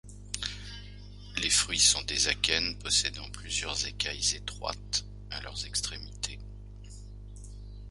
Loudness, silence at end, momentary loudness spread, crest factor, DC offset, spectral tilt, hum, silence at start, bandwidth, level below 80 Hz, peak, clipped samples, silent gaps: -29 LUFS; 0 s; 23 LU; 26 dB; under 0.1%; -0.5 dB/octave; 50 Hz at -45 dBFS; 0.05 s; 11.5 kHz; -46 dBFS; -6 dBFS; under 0.1%; none